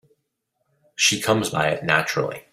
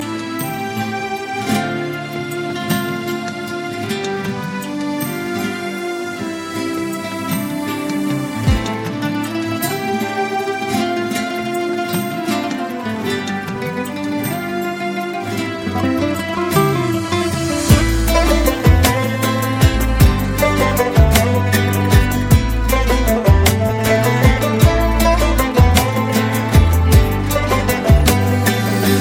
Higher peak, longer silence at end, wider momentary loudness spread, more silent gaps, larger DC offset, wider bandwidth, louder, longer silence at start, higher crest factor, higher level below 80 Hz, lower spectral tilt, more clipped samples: about the same, -2 dBFS vs 0 dBFS; about the same, 0.1 s vs 0 s; second, 7 LU vs 10 LU; neither; neither; about the same, 16 kHz vs 17 kHz; second, -21 LUFS vs -17 LUFS; first, 1 s vs 0 s; first, 22 dB vs 16 dB; second, -60 dBFS vs -22 dBFS; second, -3 dB/octave vs -5.5 dB/octave; neither